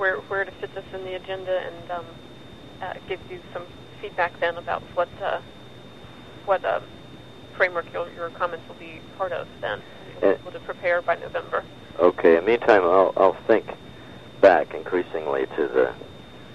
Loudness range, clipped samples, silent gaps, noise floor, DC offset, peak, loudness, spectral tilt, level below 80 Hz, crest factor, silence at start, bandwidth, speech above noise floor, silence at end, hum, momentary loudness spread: 11 LU; under 0.1%; none; -44 dBFS; 0.3%; -2 dBFS; -24 LUFS; -6.5 dB/octave; -56 dBFS; 24 dB; 0 s; 9.4 kHz; 20 dB; 0 s; none; 25 LU